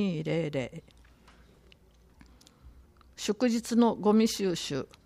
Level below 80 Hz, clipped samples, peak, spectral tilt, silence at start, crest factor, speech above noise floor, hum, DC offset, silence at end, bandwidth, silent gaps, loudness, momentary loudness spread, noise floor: -60 dBFS; under 0.1%; -12 dBFS; -5.5 dB/octave; 0 s; 18 dB; 31 dB; none; under 0.1%; 0.2 s; 15 kHz; none; -28 LUFS; 12 LU; -59 dBFS